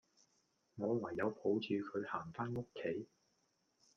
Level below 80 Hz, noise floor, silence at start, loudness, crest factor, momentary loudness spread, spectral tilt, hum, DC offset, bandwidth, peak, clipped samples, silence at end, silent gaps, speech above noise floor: -76 dBFS; -80 dBFS; 0.75 s; -41 LUFS; 18 dB; 8 LU; -7.5 dB/octave; none; under 0.1%; 7.2 kHz; -24 dBFS; under 0.1%; 0.9 s; none; 40 dB